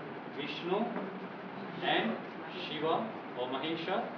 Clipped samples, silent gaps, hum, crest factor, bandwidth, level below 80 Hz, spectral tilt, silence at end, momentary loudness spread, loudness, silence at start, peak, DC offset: under 0.1%; none; none; 18 dB; 5.4 kHz; -90 dBFS; -6.5 dB/octave; 0 s; 11 LU; -36 LUFS; 0 s; -18 dBFS; under 0.1%